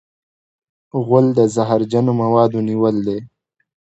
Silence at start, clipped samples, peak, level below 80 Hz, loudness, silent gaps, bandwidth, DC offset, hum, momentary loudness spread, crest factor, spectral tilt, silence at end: 0.95 s; under 0.1%; 0 dBFS; -58 dBFS; -16 LUFS; none; 8.2 kHz; under 0.1%; none; 10 LU; 18 dB; -8 dB/octave; 0.55 s